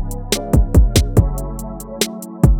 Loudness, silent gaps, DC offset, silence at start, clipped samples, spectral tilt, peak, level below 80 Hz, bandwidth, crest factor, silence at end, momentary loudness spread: -17 LUFS; none; under 0.1%; 0 s; 0.1%; -5.5 dB/octave; 0 dBFS; -18 dBFS; 19 kHz; 16 dB; 0 s; 14 LU